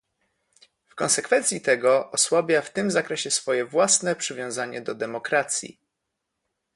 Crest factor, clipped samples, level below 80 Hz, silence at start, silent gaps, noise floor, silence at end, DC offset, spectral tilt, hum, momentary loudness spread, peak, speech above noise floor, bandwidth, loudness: 18 dB; under 0.1%; -72 dBFS; 0.95 s; none; -81 dBFS; 1.05 s; under 0.1%; -2 dB/octave; none; 10 LU; -6 dBFS; 57 dB; 11.5 kHz; -23 LUFS